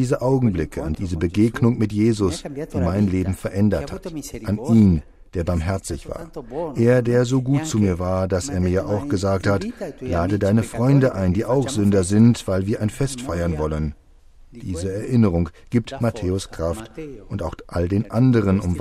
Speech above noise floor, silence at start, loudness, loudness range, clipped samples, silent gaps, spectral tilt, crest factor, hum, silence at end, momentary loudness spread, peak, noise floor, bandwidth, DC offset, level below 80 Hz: 27 dB; 0 s; -21 LUFS; 5 LU; under 0.1%; none; -7 dB/octave; 18 dB; none; 0 s; 13 LU; -4 dBFS; -47 dBFS; 14 kHz; under 0.1%; -38 dBFS